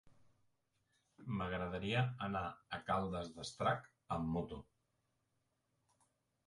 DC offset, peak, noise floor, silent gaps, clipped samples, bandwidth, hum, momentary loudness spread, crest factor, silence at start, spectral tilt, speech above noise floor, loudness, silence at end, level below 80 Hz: under 0.1%; -22 dBFS; -84 dBFS; none; under 0.1%; 11.5 kHz; none; 10 LU; 22 dB; 0.05 s; -6 dB/octave; 43 dB; -41 LUFS; 1.85 s; -62 dBFS